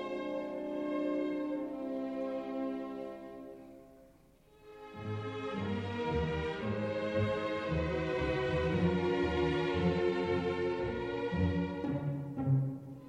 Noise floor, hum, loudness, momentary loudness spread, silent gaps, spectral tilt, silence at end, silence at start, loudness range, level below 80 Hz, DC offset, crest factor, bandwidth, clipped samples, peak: -62 dBFS; none; -35 LUFS; 10 LU; none; -8 dB/octave; 0 s; 0 s; 10 LU; -52 dBFS; under 0.1%; 16 dB; 9.6 kHz; under 0.1%; -18 dBFS